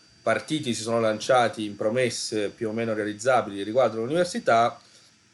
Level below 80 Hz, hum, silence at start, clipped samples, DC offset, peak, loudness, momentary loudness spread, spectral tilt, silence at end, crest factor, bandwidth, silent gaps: -68 dBFS; none; 0.25 s; under 0.1%; under 0.1%; -10 dBFS; -25 LUFS; 7 LU; -4.5 dB/octave; 0.55 s; 16 dB; 12 kHz; none